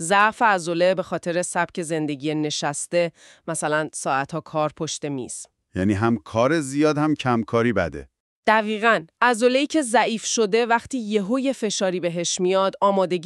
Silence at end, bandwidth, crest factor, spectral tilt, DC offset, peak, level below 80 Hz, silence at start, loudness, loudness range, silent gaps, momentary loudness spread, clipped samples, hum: 0 s; 13 kHz; 18 dB; -4 dB/octave; under 0.1%; -4 dBFS; -58 dBFS; 0 s; -22 LUFS; 5 LU; 8.20-8.43 s; 8 LU; under 0.1%; none